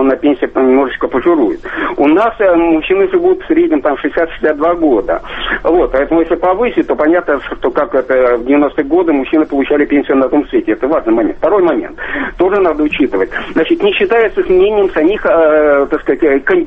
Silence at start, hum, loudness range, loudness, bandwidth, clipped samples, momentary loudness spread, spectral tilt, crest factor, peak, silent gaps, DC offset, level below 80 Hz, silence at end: 0 s; none; 2 LU; -12 LUFS; 4.5 kHz; under 0.1%; 5 LU; -7.5 dB/octave; 10 dB; 0 dBFS; none; under 0.1%; -36 dBFS; 0 s